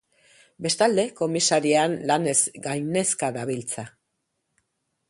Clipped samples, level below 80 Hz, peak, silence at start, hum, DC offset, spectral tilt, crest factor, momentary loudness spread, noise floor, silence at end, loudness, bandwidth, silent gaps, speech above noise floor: under 0.1%; -68 dBFS; -6 dBFS; 0.6 s; none; under 0.1%; -3 dB/octave; 20 dB; 11 LU; -77 dBFS; 1.2 s; -23 LUFS; 11.5 kHz; none; 54 dB